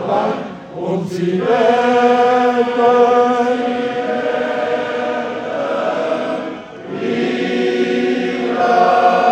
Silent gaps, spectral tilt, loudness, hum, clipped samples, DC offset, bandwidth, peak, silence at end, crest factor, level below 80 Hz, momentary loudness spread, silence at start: none; -6 dB/octave; -16 LUFS; none; under 0.1%; under 0.1%; 8.8 kHz; 0 dBFS; 0 s; 14 dB; -60 dBFS; 10 LU; 0 s